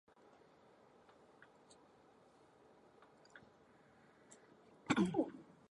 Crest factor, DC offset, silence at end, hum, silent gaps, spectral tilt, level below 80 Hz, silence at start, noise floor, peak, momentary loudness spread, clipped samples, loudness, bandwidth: 26 dB; under 0.1%; 0.3 s; none; none; -6 dB/octave; -78 dBFS; 3.35 s; -68 dBFS; -20 dBFS; 30 LU; under 0.1%; -38 LUFS; 10.5 kHz